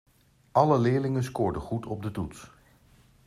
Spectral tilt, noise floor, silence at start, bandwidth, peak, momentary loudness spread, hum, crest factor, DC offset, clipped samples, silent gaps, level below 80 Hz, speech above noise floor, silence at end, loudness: -8 dB/octave; -59 dBFS; 0.55 s; 14 kHz; -6 dBFS; 14 LU; none; 22 dB; under 0.1%; under 0.1%; none; -54 dBFS; 33 dB; 0.8 s; -27 LUFS